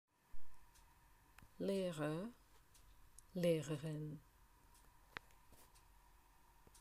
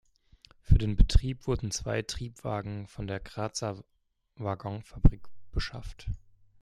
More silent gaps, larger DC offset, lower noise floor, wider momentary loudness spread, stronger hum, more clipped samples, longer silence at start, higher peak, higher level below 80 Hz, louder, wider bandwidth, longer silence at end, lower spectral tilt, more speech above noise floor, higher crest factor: neither; neither; first, -69 dBFS vs -60 dBFS; first, 27 LU vs 14 LU; neither; neither; second, 0.35 s vs 0.7 s; second, -26 dBFS vs -8 dBFS; second, -70 dBFS vs -32 dBFS; second, -44 LUFS vs -32 LUFS; first, 15.5 kHz vs 12 kHz; second, 0 s vs 0.45 s; about the same, -6.5 dB/octave vs -5.5 dB/octave; second, 27 dB vs 32 dB; about the same, 20 dB vs 22 dB